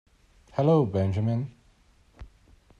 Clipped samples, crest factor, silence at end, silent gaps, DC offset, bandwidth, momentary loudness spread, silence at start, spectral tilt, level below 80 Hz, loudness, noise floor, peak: under 0.1%; 18 dB; 0.55 s; none; under 0.1%; 7.4 kHz; 12 LU; 0.55 s; -9.5 dB/octave; -56 dBFS; -26 LUFS; -60 dBFS; -10 dBFS